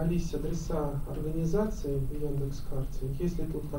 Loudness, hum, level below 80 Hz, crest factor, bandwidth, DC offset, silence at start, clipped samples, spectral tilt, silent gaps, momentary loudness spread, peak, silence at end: -33 LUFS; none; -36 dBFS; 14 dB; 16 kHz; under 0.1%; 0 s; under 0.1%; -7.5 dB/octave; none; 6 LU; -16 dBFS; 0 s